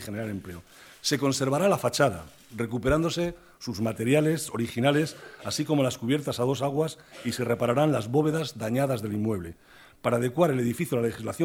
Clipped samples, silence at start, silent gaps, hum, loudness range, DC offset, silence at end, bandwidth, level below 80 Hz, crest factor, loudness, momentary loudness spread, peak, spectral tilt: under 0.1%; 0 s; none; none; 1 LU; under 0.1%; 0 s; 18 kHz; -54 dBFS; 18 dB; -27 LUFS; 11 LU; -8 dBFS; -5.5 dB/octave